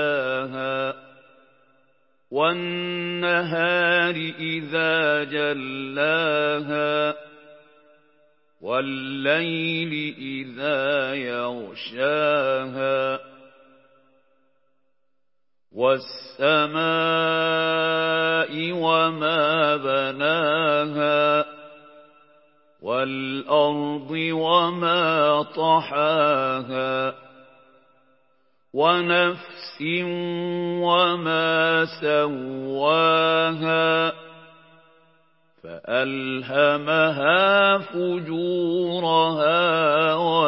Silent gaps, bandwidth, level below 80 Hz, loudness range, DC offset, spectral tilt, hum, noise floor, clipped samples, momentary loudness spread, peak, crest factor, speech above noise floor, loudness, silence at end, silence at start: none; 5.8 kHz; -78 dBFS; 6 LU; under 0.1%; -9.5 dB/octave; none; -82 dBFS; under 0.1%; 9 LU; -4 dBFS; 18 dB; 60 dB; -22 LUFS; 0 s; 0 s